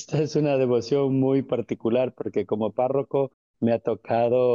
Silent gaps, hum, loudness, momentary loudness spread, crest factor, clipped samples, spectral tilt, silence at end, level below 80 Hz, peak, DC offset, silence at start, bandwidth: 3.34-3.54 s; none; -24 LUFS; 6 LU; 12 dB; under 0.1%; -7.5 dB/octave; 0 s; -68 dBFS; -12 dBFS; under 0.1%; 0 s; 7.4 kHz